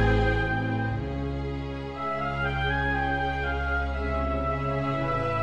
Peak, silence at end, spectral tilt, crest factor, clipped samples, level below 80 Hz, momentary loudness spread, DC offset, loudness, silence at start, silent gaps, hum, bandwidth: -10 dBFS; 0 s; -7.5 dB/octave; 16 dB; under 0.1%; -34 dBFS; 6 LU; 0.4%; -28 LUFS; 0 s; none; none; 8 kHz